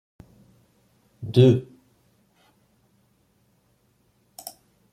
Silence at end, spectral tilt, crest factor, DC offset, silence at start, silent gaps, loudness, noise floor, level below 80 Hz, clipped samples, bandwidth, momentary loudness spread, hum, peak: 3.3 s; -8 dB/octave; 24 dB; under 0.1%; 1.2 s; none; -20 LUFS; -65 dBFS; -64 dBFS; under 0.1%; 15 kHz; 24 LU; none; -4 dBFS